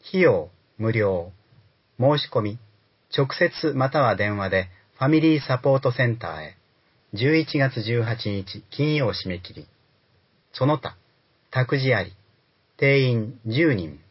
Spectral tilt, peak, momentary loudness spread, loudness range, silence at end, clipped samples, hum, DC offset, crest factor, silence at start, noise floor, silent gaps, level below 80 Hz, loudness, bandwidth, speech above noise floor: -10.5 dB/octave; -6 dBFS; 15 LU; 5 LU; 0.15 s; under 0.1%; none; under 0.1%; 18 dB; 0.05 s; -64 dBFS; none; -52 dBFS; -23 LUFS; 5.8 kHz; 42 dB